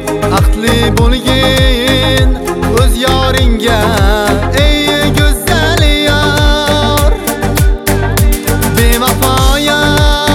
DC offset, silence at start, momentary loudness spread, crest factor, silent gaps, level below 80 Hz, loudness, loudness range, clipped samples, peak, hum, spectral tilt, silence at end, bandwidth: under 0.1%; 0 s; 3 LU; 10 dB; none; -14 dBFS; -10 LUFS; 1 LU; under 0.1%; 0 dBFS; none; -4.5 dB/octave; 0 s; 19.5 kHz